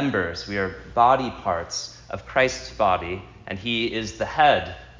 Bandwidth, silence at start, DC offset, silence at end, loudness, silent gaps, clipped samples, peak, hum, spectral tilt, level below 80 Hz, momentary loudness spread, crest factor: 7.6 kHz; 0 s; under 0.1%; 0 s; -23 LUFS; none; under 0.1%; -4 dBFS; none; -4 dB/octave; -46 dBFS; 13 LU; 20 dB